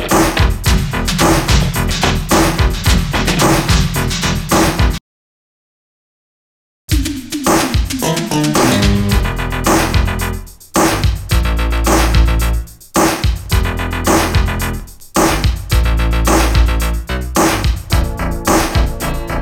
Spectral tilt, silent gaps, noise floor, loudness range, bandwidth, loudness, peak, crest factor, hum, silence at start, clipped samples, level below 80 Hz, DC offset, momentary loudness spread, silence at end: -4.5 dB/octave; 5.01-6.88 s; under -90 dBFS; 5 LU; 17.5 kHz; -14 LUFS; 0 dBFS; 14 dB; none; 0 s; under 0.1%; -18 dBFS; under 0.1%; 7 LU; 0 s